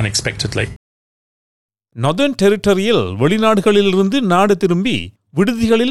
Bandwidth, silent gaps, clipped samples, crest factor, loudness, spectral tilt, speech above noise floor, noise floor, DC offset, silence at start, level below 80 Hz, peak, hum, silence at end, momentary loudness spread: 13.5 kHz; 0.76-1.69 s; under 0.1%; 12 dB; -15 LUFS; -5.5 dB/octave; over 76 dB; under -90 dBFS; 2%; 0 s; -44 dBFS; -2 dBFS; none; 0 s; 8 LU